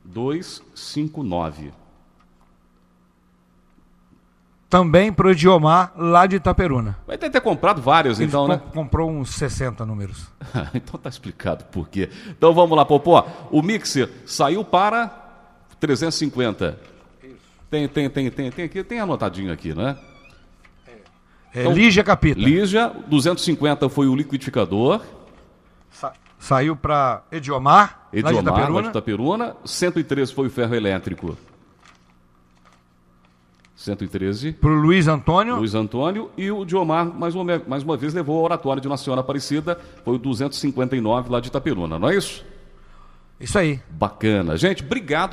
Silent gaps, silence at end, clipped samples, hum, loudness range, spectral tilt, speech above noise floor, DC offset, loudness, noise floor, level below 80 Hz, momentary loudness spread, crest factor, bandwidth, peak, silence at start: none; 0 s; under 0.1%; none; 10 LU; -6 dB/octave; 39 dB; under 0.1%; -20 LUFS; -58 dBFS; -42 dBFS; 14 LU; 20 dB; 14.5 kHz; 0 dBFS; 0.05 s